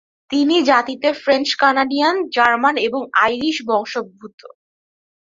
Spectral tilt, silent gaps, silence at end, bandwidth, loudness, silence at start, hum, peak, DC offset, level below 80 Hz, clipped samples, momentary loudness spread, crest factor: -3 dB/octave; 4.34-4.38 s; 0.75 s; 7.8 kHz; -17 LUFS; 0.3 s; none; -2 dBFS; under 0.1%; -62 dBFS; under 0.1%; 7 LU; 16 dB